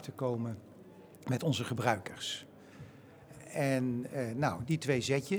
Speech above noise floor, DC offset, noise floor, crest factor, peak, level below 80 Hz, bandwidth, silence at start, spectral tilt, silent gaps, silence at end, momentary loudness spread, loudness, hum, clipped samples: 21 dB; under 0.1%; -54 dBFS; 22 dB; -12 dBFS; -68 dBFS; over 20 kHz; 0 s; -5.5 dB/octave; none; 0 s; 22 LU; -34 LUFS; none; under 0.1%